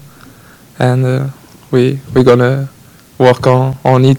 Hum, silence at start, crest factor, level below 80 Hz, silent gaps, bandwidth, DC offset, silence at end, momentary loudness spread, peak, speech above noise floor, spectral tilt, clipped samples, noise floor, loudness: none; 0.8 s; 12 dB; -46 dBFS; none; 12.5 kHz; under 0.1%; 0 s; 9 LU; 0 dBFS; 30 dB; -7.5 dB/octave; 0.7%; -40 dBFS; -12 LUFS